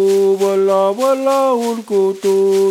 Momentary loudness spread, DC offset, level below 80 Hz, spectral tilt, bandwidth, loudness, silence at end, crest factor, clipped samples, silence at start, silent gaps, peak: 3 LU; under 0.1%; -74 dBFS; -5.5 dB/octave; 16 kHz; -15 LUFS; 0 s; 10 dB; under 0.1%; 0 s; none; -4 dBFS